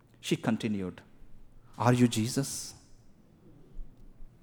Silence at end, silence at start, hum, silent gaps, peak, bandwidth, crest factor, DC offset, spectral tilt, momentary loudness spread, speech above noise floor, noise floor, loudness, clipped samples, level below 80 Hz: 0.15 s; 0.25 s; none; none; -8 dBFS; over 20 kHz; 26 dB; under 0.1%; -5.5 dB/octave; 13 LU; 28 dB; -57 dBFS; -30 LUFS; under 0.1%; -52 dBFS